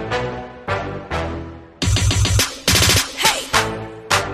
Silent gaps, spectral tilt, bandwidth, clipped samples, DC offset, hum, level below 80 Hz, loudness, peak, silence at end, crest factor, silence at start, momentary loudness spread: none; -3 dB/octave; 15.5 kHz; under 0.1%; under 0.1%; none; -30 dBFS; -18 LUFS; 0 dBFS; 0 s; 18 dB; 0 s; 14 LU